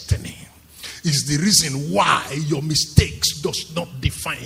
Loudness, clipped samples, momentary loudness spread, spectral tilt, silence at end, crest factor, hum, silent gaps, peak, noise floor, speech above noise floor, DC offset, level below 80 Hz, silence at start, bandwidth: -19 LUFS; under 0.1%; 12 LU; -3.5 dB/octave; 0 s; 20 dB; none; none; 0 dBFS; -43 dBFS; 23 dB; under 0.1%; -36 dBFS; 0 s; 16 kHz